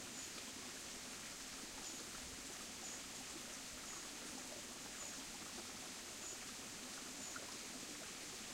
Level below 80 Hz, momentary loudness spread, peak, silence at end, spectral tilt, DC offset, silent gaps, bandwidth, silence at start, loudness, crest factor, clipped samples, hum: -70 dBFS; 1 LU; -34 dBFS; 0 s; -1 dB/octave; under 0.1%; none; 16 kHz; 0 s; -48 LUFS; 16 dB; under 0.1%; none